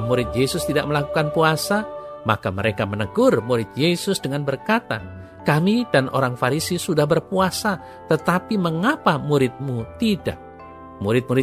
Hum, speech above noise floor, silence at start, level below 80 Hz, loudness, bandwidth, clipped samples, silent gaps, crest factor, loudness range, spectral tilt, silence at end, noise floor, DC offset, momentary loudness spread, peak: none; 19 dB; 0 s; -46 dBFS; -21 LUFS; 15.5 kHz; under 0.1%; none; 18 dB; 1 LU; -5.5 dB/octave; 0 s; -40 dBFS; under 0.1%; 10 LU; -2 dBFS